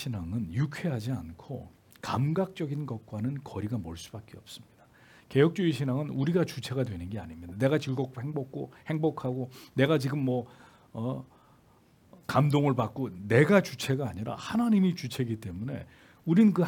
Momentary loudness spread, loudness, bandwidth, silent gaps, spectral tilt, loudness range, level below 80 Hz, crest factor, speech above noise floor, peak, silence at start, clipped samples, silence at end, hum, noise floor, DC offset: 17 LU; -30 LUFS; 17.5 kHz; none; -7 dB/octave; 7 LU; -64 dBFS; 22 dB; 32 dB; -8 dBFS; 0 s; under 0.1%; 0 s; none; -61 dBFS; under 0.1%